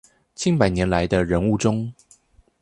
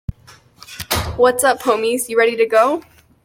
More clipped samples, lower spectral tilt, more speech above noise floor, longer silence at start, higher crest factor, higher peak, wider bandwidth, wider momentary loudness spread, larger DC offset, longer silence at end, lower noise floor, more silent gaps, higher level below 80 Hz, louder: neither; first, -6 dB/octave vs -3.5 dB/octave; about the same, 35 dB vs 32 dB; first, 0.4 s vs 0.1 s; about the same, 20 dB vs 16 dB; about the same, -2 dBFS vs -2 dBFS; second, 11 kHz vs 16.5 kHz; second, 7 LU vs 16 LU; neither; first, 0.7 s vs 0.45 s; first, -55 dBFS vs -47 dBFS; neither; about the same, -40 dBFS vs -40 dBFS; second, -21 LUFS vs -16 LUFS